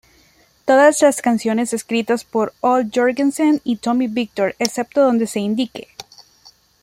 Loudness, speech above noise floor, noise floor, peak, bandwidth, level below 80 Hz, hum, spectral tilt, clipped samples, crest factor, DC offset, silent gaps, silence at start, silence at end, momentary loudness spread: -18 LUFS; 38 dB; -54 dBFS; 0 dBFS; 16 kHz; -62 dBFS; none; -4 dB/octave; under 0.1%; 18 dB; under 0.1%; none; 0.65 s; 0.6 s; 10 LU